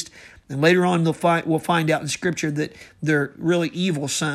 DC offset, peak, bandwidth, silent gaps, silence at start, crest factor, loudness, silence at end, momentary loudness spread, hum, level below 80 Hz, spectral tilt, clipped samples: under 0.1%; -4 dBFS; 14 kHz; none; 0 s; 18 dB; -21 LUFS; 0 s; 10 LU; none; -60 dBFS; -5 dB/octave; under 0.1%